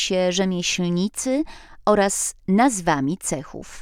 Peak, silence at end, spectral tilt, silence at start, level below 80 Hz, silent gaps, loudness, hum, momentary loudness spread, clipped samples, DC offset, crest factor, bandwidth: -4 dBFS; 0 s; -4 dB/octave; 0 s; -48 dBFS; none; -21 LUFS; none; 8 LU; under 0.1%; under 0.1%; 18 dB; 16 kHz